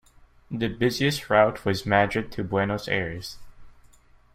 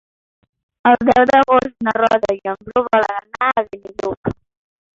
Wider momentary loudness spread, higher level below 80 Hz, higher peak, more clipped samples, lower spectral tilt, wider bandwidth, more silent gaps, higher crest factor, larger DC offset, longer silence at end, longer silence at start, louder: about the same, 12 LU vs 14 LU; about the same, -50 dBFS vs -50 dBFS; about the same, -4 dBFS vs -2 dBFS; neither; about the same, -5.5 dB/octave vs -6 dB/octave; first, 16 kHz vs 7.6 kHz; second, none vs 4.17-4.23 s; first, 22 dB vs 16 dB; neither; about the same, 0.65 s vs 0.65 s; second, 0.5 s vs 0.85 s; second, -24 LUFS vs -16 LUFS